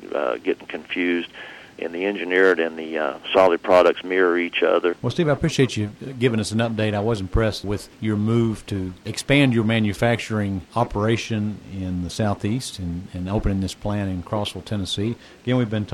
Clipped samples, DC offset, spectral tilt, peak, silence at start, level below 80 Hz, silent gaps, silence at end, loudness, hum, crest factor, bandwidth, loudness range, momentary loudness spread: under 0.1%; under 0.1%; -6 dB/octave; -6 dBFS; 0 s; -40 dBFS; none; 0 s; -22 LUFS; none; 16 dB; 16.5 kHz; 6 LU; 12 LU